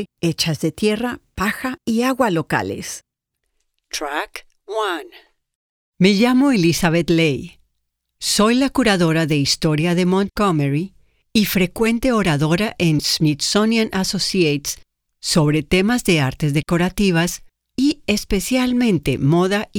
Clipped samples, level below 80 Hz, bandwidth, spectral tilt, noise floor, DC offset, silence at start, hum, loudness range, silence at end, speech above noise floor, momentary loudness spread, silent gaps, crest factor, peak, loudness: under 0.1%; -42 dBFS; 19.5 kHz; -5 dB/octave; -75 dBFS; under 0.1%; 0 s; none; 6 LU; 0 s; 58 dB; 10 LU; 5.55-5.92 s; 18 dB; 0 dBFS; -18 LUFS